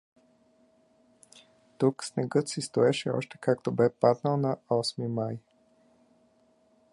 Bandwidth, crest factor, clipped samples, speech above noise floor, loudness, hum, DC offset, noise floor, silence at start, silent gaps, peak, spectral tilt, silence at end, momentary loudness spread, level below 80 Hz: 11.5 kHz; 22 dB; under 0.1%; 38 dB; -28 LUFS; none; under 0.1%; -66 dBFS; 1.8 s; none; -8 dBFS; -6 dB/octave; 1.55 s; 8 LU; -72 dBFS